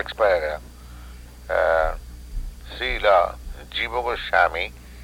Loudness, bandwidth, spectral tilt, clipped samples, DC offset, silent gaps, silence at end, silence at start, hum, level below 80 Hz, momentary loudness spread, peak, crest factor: -22 LUFS; 16.5 kHz; -4 dB/octave; under 0.1%; under 0.1%; none; 0 s; 0 s; 60 Hz at -40 dBFS; -36 dBFS; 23 LU; -6 dBFS; 18 dB